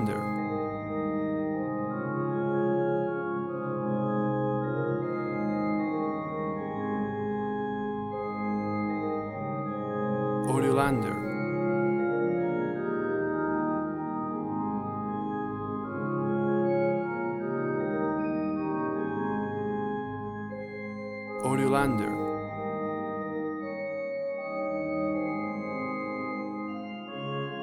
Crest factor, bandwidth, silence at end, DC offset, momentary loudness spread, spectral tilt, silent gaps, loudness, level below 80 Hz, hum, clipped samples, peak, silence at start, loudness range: 18 dB; 13 kHz; 0 s; under 0.1%; 7 LU; -7.5 dB/octave; none; -30 LUFS; -60 dBFS; none; under 0.1%; -10 dBFS; 0 s; 4 LU